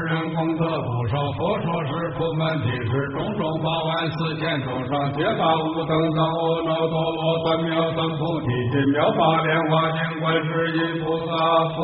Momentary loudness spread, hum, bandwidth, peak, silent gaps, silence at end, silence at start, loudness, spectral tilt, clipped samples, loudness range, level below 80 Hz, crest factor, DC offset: 5 LU; none; 4.6 kHz; -6 dBFS; none; 0 s; 0 s; -22 LUFS; -5 dB/octave; under 0.1%; 3 LU; -52 dBFS; 16 dB; under 0.1%